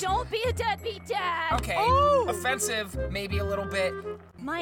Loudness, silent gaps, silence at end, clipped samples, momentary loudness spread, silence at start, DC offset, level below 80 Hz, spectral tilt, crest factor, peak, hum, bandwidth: -27 LUFS; none; 0 s; under 0.1%; 11 LU; 0 s; under 0.1%; -42 dBFS; -4 dB/octave; 16 dB; -12 dBFS; none; 19 kHz